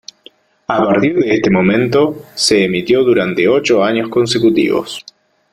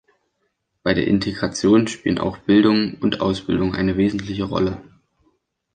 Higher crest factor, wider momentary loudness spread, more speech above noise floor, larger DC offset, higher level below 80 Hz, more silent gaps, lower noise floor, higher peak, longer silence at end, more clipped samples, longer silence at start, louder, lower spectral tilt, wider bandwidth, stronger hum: about the same, 14 dB vs 18 dB; about the same, 7 LU vs 8 LU; second, 33 dB vs 53 dB; neither; second, -50 dBFS vs -44 dBFS; neither; second, -46 dBFS vs -72 dBFS; first, 0 dBFS vs -4 dBFS; second, 0.5 s vs 0.95 s; neither; second, 0.7 s vs 0.85 s; first, -13 LUFS vs -20 LUFS; about the same, -5 dB/octave vs -6 dB/octave; first, 14 kHz vs 9.4 kHz; neither